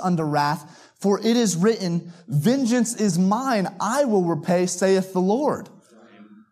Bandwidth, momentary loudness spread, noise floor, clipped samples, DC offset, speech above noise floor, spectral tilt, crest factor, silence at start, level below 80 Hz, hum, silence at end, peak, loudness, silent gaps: 15 kHz; 6 LU; -49 dBFS; under 0.1%; under 0.1%; 28 dB; -5.5 dB/octave; 14 dB; 0 s; -72 dBFS; none; 0.3 s; -8 dBFS; -22 LUFS; none